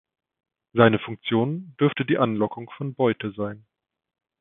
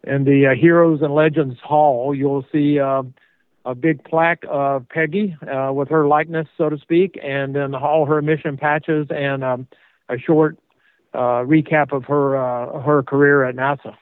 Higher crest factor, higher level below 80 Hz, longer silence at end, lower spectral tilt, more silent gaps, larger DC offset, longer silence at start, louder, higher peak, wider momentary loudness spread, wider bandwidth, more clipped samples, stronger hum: first, 24 dB vs 16 dB; about the same, -62 dBFS vs -66 dBFS; first, 0.85 s vs 0.1 s; about the same, -11.5 dB/octave vs -11 dB/octave; neither; neither; first, 0.75 s vs 0.05 s; second, -24 LUFS vs -18 LUFS; about the same, -2 dBFS vs -2 dBFS; first, 13 LU vs 9 LU; about the same, 3.9 kHz vs 4.1 kHz; neither; neither